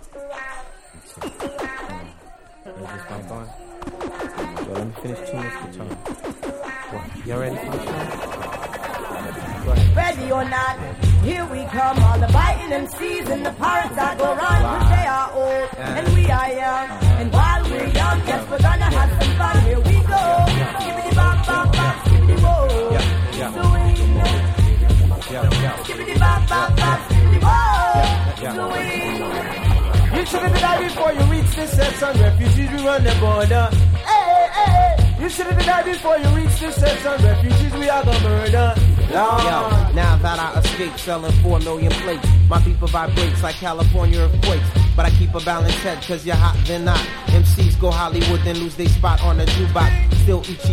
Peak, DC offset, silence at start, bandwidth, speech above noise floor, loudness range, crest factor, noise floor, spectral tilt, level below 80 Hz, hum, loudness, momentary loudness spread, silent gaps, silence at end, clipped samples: 0 dBFS; under 0.1%; 0.05 s; 15.5 kHz; 27 dB; 13 LU; 16 dB; -43 dBFS; -6 dB/octave; -22 dBFS; none; -18 LUFS; 14 LU; none; 0 s; under 0.1%